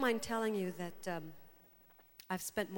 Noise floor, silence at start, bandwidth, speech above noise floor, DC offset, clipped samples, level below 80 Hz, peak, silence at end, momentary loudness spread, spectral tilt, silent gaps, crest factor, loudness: -65 dBFS; 0 s; 19 kHz; 27 dB; under 0.1%; under 0.1%; -72 dBFS; -18 dBFS; 0 s; 22 LU; -4.5 dB/octave; none; 22 dB; -39 LUFS